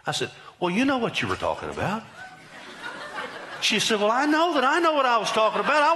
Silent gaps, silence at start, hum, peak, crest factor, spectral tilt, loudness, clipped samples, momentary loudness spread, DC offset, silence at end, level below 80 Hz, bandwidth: none; 0.05 s; none; -10 dBFS; 14 dB; -3.5 dB/octave; -23 LUFS; under 0.1%; 17 LU; under 0.1%; 0 s; -60 dBFS; 12 kHz